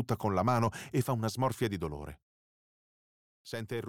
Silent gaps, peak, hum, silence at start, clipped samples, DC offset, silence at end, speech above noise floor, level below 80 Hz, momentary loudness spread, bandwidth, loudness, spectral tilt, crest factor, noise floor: 2.22-3.45 s; -16 dBFS; none; 0 s; under 0.1%; under 0.1%; 0 s; over 58 dB; -58 dBFS; 13 LU; 17 kHz; -33 LUFS; -6.5 dB/octave; 18 dB; under -90 dBFS